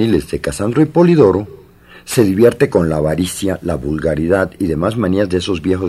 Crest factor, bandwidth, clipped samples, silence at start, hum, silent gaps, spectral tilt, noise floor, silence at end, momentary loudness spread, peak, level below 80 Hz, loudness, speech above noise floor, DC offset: 14 dB; 14.5 kHz; under 0.1%; 0 s; none; none; -6.5 dB/octave; -41 dBFS; 0 s; 9 LU; 0 dBFS; -38 dBFS; -15 LUFS; 27 dB; under 0.1%